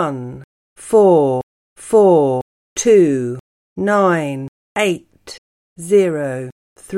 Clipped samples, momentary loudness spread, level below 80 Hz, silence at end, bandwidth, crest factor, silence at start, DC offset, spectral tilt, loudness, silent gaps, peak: under 0.1%; 24 LU; -58 dBFS; 0 s; 13 kHz; 14 dB; 0 s; under 0.1%; -5.5 dB/octave; -15 LUFS; 0.44-0.76 s, 1.43-1.76 s, 2.42-2.76 s, 3.40-3.76 s, 4.48-4.75 s, 5.38-5.76 s, 6.52-6.76 s; -2 dBFS